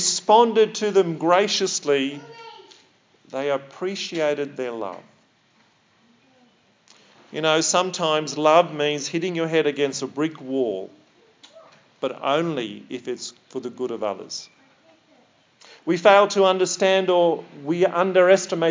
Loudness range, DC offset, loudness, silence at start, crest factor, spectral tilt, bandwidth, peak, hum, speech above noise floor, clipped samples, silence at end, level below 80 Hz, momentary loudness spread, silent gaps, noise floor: 10 LU; under 0.1%; -21 LUFS; 0 s; 22 dB; -3.5 dB/octave; 7.8 kHz; 0 dBFS; none; 40 dB; under 0.1%; 0 s; -84 dBFS; 17 LU; none; -61 dBFS